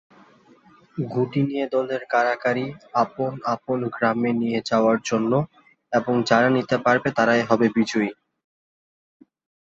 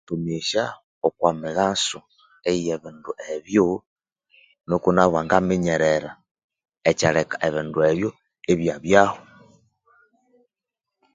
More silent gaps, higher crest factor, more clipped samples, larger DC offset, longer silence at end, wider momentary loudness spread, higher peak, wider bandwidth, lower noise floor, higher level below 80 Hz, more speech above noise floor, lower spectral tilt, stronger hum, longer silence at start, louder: second, none vs 0.83-1.01 s, 3.87-3.96 s, 6.31-6.35 s, 6.44-6.49 s; about the same, 20 dB vs 24 dB; neither; neither; second, 1.5 s vs 1.95 s; second, 8 LU vs 13 LU; second, -4 dBFS vs 0 dBFS; second, 8 kHz vs 9.6 kHz; second, -54 dBFS vs -86 dBFS; second, -64 dBFS vs -54 dBFS; second, 32 dB vs 65 dB; about the same, -6 dB/octave vs -5 dB/octave; neither; first, 0.95 s vs 0.1 s; about the same, -22 LUFS vs -22 LUFS